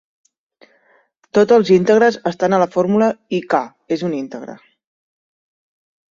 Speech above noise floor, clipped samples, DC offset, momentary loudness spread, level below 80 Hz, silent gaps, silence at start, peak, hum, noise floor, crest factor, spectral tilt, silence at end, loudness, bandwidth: 42 dB; under 0.1%; under 0.1%; 13 LU; -62 dBFS; none; 1.35 s; -2 dBFS; none; -57 dBFS; 16 dB; -6.5 dB/octave; 1.55 s; -16 LUFS; 7.4 kHz